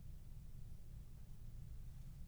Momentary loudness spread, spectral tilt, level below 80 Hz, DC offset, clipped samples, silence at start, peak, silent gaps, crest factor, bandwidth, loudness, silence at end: 2 LU; -6.5 dB/octave; -54 dBFS; under 0.1%; under 0.1%; 0 s; -40 dBFS; none; 12 dB; over 20 kHz; -58 LUFS; 0 s